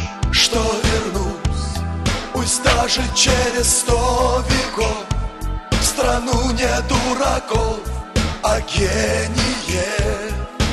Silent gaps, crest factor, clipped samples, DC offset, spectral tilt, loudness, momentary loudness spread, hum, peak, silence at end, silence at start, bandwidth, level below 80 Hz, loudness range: none; 16 dB; under 0.1%; under 0.1%; -3.5 dB/octave; -18 LUFS; 9 LU; none; -2 dBFS; 0 s; 0 s; 13 kHz; -24 dBFS; 3 LU